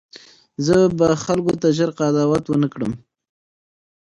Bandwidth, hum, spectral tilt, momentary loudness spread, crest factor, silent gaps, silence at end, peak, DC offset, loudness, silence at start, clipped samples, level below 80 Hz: 11.5 kHz; none; -6.5 dB/octave; 11 LU; 16 dB; none; 1.2 s; -4 dBFS; under 0.1%; -19 LUFS; 0.15 s; under 0.1%; -50 dBFS